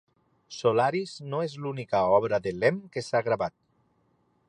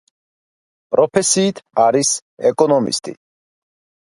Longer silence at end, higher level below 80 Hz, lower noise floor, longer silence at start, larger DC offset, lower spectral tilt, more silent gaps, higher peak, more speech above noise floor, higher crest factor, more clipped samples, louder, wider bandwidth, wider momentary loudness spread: about the same, 1 s vs 1 s; about the same, -64 dBFS vs -64 dBFS; second, -69 dBFS vs under -90 dBFS; second, 0.5 s vs 0.9 s; neither; first, -6 dB/octave vs -3.5 dB/octave; second, none vs 2.22-2.37 s; second, -10 dBFS vs 0 dBFS; second, 42 dB vs over 74 dB; about the same, 20 dB vs 18 dB; neither; second, -27 LUFS vs -16 LUFS; about the same, 10.5 kHz vs 11.5 kHz; first, 11 LU vs 7 LU